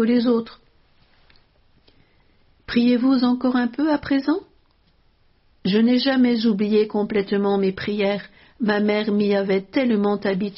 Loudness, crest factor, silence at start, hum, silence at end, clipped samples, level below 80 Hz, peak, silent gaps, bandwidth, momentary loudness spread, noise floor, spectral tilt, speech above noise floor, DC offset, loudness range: -20 LUFS; 14 dB; 0 s; none; 0 s; under 0.1%; -56 dBFS; -6 dBFS; none; 5.8 kHz; 6 LU; -59 dBFS; -5 dB/octave; 40 dB; under 0.1%; 3 LU